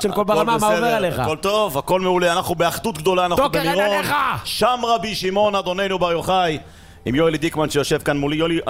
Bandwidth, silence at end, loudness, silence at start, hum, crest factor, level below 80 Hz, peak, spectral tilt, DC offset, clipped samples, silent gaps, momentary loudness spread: 16 kHz; 0 s; -19 LUFS; 0 s; none; 14 dB; -44 dBFS; -6 dBFS; -4.5 dB/octave; under 0.1%; under 0.1%; none; 4 LU